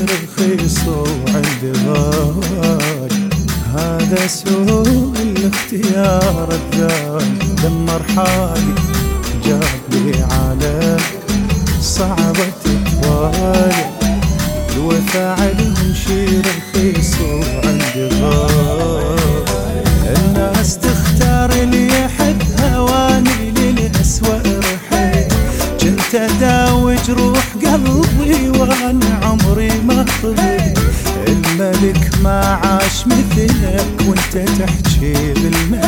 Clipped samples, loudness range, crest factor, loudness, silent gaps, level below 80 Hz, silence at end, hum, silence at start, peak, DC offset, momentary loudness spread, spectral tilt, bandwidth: under 0.1%; 2 LU; 12 dB; -14 LUFS; none; -22 dBFS; 0 s; none; 0 s; 0 dBFS; under 0.1%; 4 LU; -5 dB/octave; 19 kHz